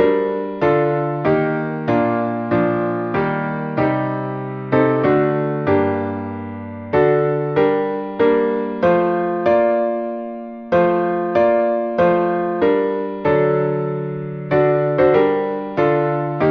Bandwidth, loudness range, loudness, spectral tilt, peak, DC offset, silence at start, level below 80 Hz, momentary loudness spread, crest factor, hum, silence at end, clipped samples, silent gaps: 5.8 kHz; 2 LU; -18 LUFS; -9.5 dB/octave; -2 dBFS; under 0.1%; 0 s; -52 dBFS; 8 LU; 16 dB; none; 0 s; under 0.1%; none